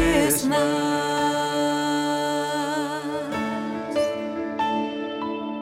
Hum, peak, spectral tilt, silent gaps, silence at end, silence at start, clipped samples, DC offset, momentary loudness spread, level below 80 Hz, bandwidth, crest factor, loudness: none; -6 dBFS; -4 dB/octave; none; 0 s; 0 s; under 0.1%; under 0.1%; 9 LU; -46 dBFS; 16 kHz; 18 dB; -24 LUFS